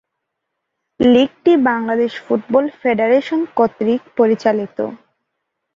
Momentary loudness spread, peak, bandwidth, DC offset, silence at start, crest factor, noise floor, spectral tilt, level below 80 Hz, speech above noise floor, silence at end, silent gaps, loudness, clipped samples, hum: 7 LU; -2 dBFS; 7.4 kHz; under 0.1%; 1 s; 16 dB; -77 dBFS; -6.5 dB/octave; -56 dBFS; 61 dB; 0.8 s; none; -16 LUFS; under 0.1%; none